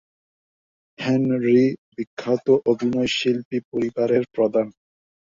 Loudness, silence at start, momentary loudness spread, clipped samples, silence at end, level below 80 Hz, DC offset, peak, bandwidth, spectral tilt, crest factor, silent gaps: -21 LUFS; 1 s; 11 LU; under 0.1%; 0.6 s; -62 dBFS; under 0.1%; -6 dBFS; 7.6 kHz; -6 dB/octave; 18 dB; 1.78-1.92 s, 2.07-2.17 s, 3.45-3.51 s, 3.65-3.72 s